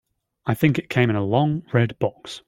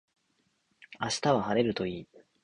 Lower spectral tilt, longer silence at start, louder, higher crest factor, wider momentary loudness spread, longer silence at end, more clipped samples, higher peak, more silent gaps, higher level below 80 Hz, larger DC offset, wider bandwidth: first, -7.5 dB/octave vs -4.5 dB/octave; second, 0.45 s vs 0.9 s; first, -22 LUFS vs -30 LUFS; about the same, 18 dB vs 20 dB; second, 7 LU vs 11 LU; second, 0.1 s vs 0.4 s; neither; first, -4 dBFS vs -12 dBFS; neither; first, -56 dBFS vs -64 dBFS; neither; first, 16.5 kHz vs 11.5 kHz